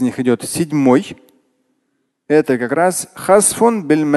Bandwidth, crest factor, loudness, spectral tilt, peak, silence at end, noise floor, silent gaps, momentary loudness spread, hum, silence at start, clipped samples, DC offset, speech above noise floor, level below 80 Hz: 12.5 kHz; 16 dB; -15 LUFS; -4.5 dB/octave; 0 dBFS; 0 s; -68 dBFS; none; 6 LU; none; 0 s; under 0.1%; under 0.1%; 54 dB; -56 dBFS